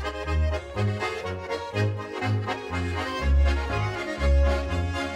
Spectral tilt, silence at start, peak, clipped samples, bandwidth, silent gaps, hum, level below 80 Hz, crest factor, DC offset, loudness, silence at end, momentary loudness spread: -6.5 dB/octave; 0 s; -14 dBFS; under 0.1%; 10 kHz; none; none; -28 dBFS; 12 dB; under 0.1%; -27 LUFS; 0 s; 7 LU